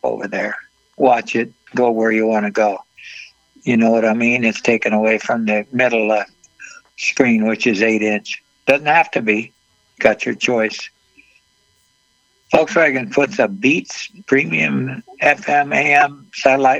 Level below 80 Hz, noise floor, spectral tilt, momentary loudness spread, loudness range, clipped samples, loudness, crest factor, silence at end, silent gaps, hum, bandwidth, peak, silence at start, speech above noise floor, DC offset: -60 dBFS; -61 dBFS; -5 dB/octave; 13 LU; 3 LU; under 0.1%; -16 LUFS; 18 dB; 0 s; none; none; 8.4 kHz; 0 dBFS; 0.05 s; 45 dB; under 0.1%